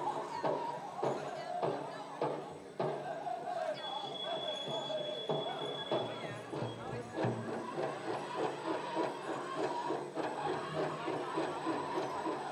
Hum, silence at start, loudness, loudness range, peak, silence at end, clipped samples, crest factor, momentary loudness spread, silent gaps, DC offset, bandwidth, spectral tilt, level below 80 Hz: none; 0 s; -39 LUFS; 1 LU; -22 dBFS; 0 s; under 0.1%; 18 dB; 4 LU; none; under 0.1%; 13 kHz; -5 dB/octave; -80 dBFS